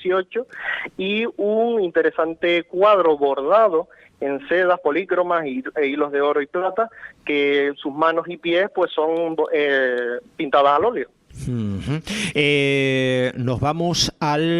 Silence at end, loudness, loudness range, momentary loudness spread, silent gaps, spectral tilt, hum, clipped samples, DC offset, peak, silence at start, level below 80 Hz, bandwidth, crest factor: 0 s; -20 LUFS; 3 LU; 10 LU; none; -5 dB/octave; none; under 0.1%; under 0.1%; -2 dBFS; 0 s; -52 dBFS; 13 kHz; 18 dB